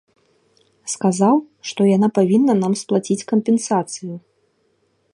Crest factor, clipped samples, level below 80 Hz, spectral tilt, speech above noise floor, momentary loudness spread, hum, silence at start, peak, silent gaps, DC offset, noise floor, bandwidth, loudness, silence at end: 16 dB; under 0.1%; -68 dBFS; -6 dB/octave; 47 dB; 15 LU; none; 0.85 s; -2 dBFS; none; under 0.1%; -64 dBFS; 11.5 kHz; -18 LUFS; 0.95 s